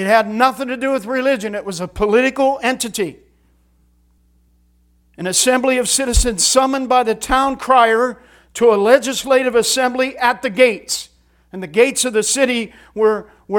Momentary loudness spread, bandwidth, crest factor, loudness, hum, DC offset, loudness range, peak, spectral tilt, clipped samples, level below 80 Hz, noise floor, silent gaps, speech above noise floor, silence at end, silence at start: 10 LU; 18.5 kHz; 16 dB; -16 LUFS; none; under 0.1%; 6 LU; 0 dBFS; -2.5 dB/octave; under 0.1%; -32 dBFS; -56 dBFS; none; 40 dB; 0 s; 0 s